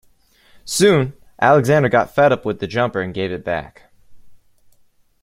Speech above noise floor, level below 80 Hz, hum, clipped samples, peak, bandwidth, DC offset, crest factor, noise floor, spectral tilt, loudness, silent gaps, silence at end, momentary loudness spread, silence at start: 39 dB; -52 dBFS; none; under 0.1%; 0 dBFS; 16.5 kHz; under 0.1%; 18 dB; -55 dBFS; -5 dB/octave; -17 LUFS; none; 0.9 s; 11 LU; 0.65 s